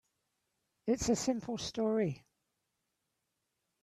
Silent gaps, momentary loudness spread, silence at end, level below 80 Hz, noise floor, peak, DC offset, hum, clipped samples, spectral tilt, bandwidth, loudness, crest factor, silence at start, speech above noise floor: none; 8 LU; 1.65 s; -60 dBFS; -85 dBFS; -18 dBFS; under 0.1%; none; under 0.1%; -5 dB/octave; 13.5 kHz; -35 LUFS; 18 dB; 0.85 s; 51 dB